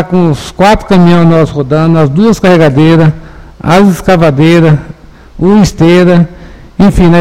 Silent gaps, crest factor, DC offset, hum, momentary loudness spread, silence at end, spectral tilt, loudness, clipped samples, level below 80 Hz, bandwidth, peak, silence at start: none; 6 dB; 3%; none; 6 LU; 0 s; -7.5 dB/octave; -6 LUFS; 4%; -26 dBFS; 13.5 kHz; 0 dBFS; 0 s